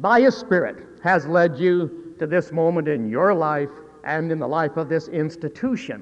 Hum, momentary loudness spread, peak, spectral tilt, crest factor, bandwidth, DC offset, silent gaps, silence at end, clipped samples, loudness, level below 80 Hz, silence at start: none; 10 LU; -4 dBFS; -7.5 dB/octave; 16 dB; 8.2 kHz; under 0.1%; none; 0 s; under 0.1%; -22 LUFS; -62 dBFS; 0 s